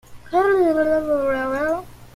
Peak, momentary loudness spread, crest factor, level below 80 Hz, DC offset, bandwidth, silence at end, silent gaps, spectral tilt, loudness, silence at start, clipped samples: -8 dBFS; 7 LU; 12 dB; -48 dBFS; under 0.1%; 15.5 kHz; 0.05 s; none; -6 dB/octave; -20 LUFS; 0.1 s; under 0.1%